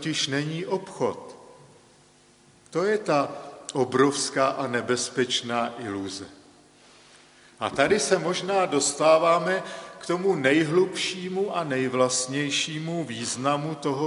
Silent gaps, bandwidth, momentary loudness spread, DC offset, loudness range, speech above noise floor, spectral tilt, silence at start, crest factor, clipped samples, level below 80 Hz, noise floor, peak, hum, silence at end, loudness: none; 11.5 kHz; 11 LU; under 0.1%; 7 LU; 32 dB; -3.5 dB/octave; 0 s; 22 dB; under 0.1%; -68 dBFS; -57 dBFS; -4 dBFS; none; 0 s; -25 LUFS